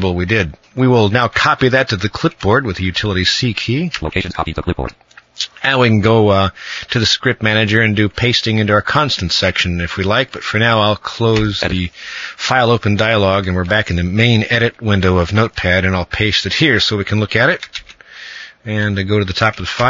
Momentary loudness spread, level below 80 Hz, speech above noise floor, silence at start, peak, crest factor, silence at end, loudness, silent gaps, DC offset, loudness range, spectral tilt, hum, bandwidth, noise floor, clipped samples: 9 LU; -36 dBFS; 21 dB; 0 s; 0 dBFS; 14 dB; 0 s; -14 LUFS; none; under 0.1%; 3 LU; -5.5 dB/octave; none; 7.6 kHz; -35 dBFS; under 0.1%